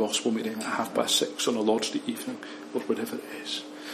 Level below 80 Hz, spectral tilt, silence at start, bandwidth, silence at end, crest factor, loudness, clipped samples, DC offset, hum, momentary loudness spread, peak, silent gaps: -80 dBFS; -2.5 dB/octave; 0 s; 14.5 kHz; 0 s; 20 dB; -29 LUFS; under 0.1%; under 0.1%; none; 11 LU; -10 dBFS; none